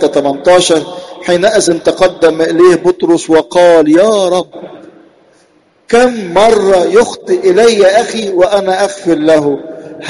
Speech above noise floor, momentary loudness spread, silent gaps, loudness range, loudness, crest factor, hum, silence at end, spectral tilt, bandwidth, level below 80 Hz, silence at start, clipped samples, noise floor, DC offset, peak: 41 dB; 8 LU; none; 3 LU; -9 LUFS; 10 dB; none; 0 s; -4 dB/octave; 11.5 kHz; -44 dBFS; 0 s; under 0.1%; -49 dBFS; under 0.1%; 0 dBFS